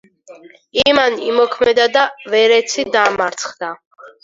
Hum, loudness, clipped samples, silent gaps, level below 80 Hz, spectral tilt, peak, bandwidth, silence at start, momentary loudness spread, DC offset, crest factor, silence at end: none; -14 LUFS; under 0.1%; 3.86-3.91 s; -54 dBFS; -2 dB/octave; 0 dBFS; 7.8 kHz; 0.3 s; 12 LU; under 0.1%; 16 dB; 0.15 s